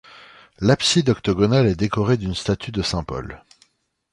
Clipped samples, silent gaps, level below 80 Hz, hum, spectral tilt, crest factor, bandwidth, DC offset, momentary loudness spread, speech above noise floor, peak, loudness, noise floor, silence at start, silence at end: under 0.1%; none; -42 dBFS; none; -5.5 dB/octave; 18 dB; 11.5 kHz; under 0.1%; 10 LU; 42 dB; -4 dBFS; -20 LUFS; -61 dBFS; 0.15 s; 0.75 s